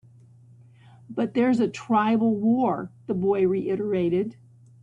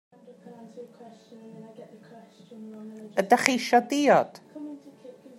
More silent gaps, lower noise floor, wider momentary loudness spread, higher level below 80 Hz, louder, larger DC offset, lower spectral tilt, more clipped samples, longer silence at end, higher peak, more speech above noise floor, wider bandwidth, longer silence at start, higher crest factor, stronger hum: neither; about the same, -52 dBFS vs -49 dBFS; second, 9 LU vs 25 LU; first, -64 dBFS vs -82 dBFS; about the same, -24 LUFS vs -23 LUFS; neither; first, -8 dB/octave vs -3.5 dB/octave; neither; first, 0.5 s vs 0.3 s; second, -10 dBFS vs 0 dBFS; first, 29 dB vs 22 dB; second, 8 kHz vs 16 kHz; first, 1.1 s vs 0.3 s; second, 14 dB vs 28 dB; neither